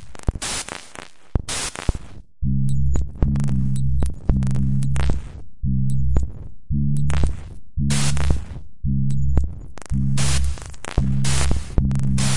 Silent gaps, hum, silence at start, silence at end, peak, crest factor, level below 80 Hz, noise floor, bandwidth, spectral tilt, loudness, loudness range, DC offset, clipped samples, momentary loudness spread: none; none; 0 s; 0 s; -2 dBFS; 18 dB; -26 dBFS; -42 dBFS; 11.5 kHz; -5 dB/octave; -23 LUFS; 2 LU; 6%; under 0.1%; 11 LU